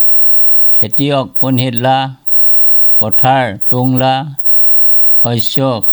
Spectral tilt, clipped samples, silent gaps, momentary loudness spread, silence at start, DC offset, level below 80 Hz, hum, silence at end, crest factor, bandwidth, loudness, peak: -6.5 dB/octave; under 0.1%; none; 8 LU; 0 s; under 0.1%; -54 dBFS; none; 0 s; 10 dB; over 20 kHz; -7 LUFS; 0 dBFS